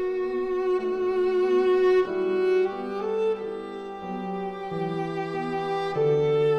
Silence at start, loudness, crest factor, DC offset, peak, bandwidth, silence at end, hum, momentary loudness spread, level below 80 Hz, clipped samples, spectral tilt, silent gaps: 0 s; -26 LUFS; 12 dB; under 0.1%; -12 dBFS; 6.6 kHz; 0 s; none; 10 LU; -58 dBFS; under 0.1%; -7.5 dB/octave; none